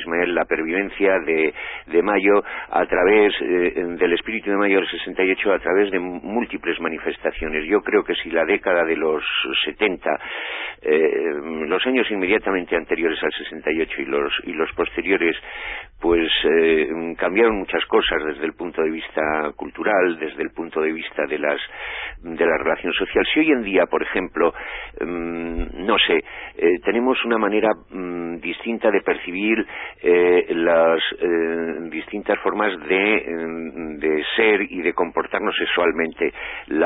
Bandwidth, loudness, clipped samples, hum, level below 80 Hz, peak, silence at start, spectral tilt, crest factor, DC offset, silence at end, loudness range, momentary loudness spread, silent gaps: 4 kHz; -21 LUFS; under 0.1%; none; -46 dBFS; -4 dBFS; 0 s; -9 dB/octave; 16 dB; under 0.1%; 0 s; 3 LU; 10 LU; none